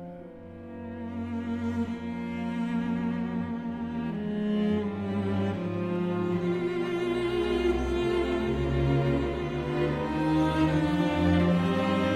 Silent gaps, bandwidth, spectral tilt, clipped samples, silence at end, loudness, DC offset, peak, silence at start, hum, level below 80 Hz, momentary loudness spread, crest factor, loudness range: none; 11 kHz; -8 dB/octave; under 0.1%; 0 s; -28 LUFS; under 0.1%; -12 dBFS; 0 s; none; -44 dBFS; 9 LU; 16 dB; 6 LU